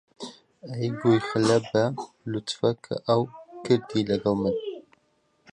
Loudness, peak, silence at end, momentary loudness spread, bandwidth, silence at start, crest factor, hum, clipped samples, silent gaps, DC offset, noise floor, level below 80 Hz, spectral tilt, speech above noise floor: -26 LUFS; -8 dBFS; 0.7 s; 18 LU; 11 kHz; 0.2 s; 18 dB; none; under 0.1%; none; under 0.1%; -68 dBFS; -60 dBFS; -6 dB/octave; 44 dB